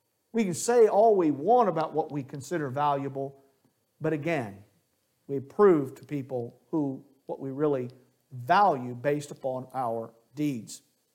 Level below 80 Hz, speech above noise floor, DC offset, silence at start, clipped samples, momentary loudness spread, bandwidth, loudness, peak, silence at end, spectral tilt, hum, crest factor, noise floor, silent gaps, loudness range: -78 dBFS; 46 dB; under 0.1%; 0.35 s; under 0.1%; 17 LU; 16.5 kHz; -27 LUFS; -10 dBFS; 0.35 s; -6 dB/octave; none; 18 dB; -73 dBFS; none; 7 LU